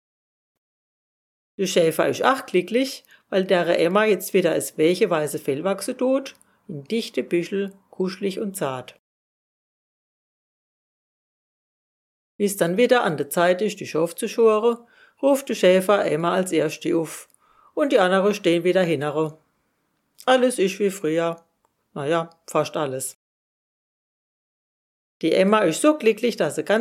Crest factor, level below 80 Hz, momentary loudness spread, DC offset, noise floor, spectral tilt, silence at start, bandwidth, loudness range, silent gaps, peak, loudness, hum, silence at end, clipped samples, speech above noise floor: 22 dB; -76 dBFS; 10 LU; under 0.1%; -71 dBFS; -4.5 dB/octave; 1.6 s; 16 kHz; 8 LU; 8.99-12.39 s, 23.15-25.20 s; -2 dBFS; -22 LUFS; none; 0 s; under 0.1%; 50 dB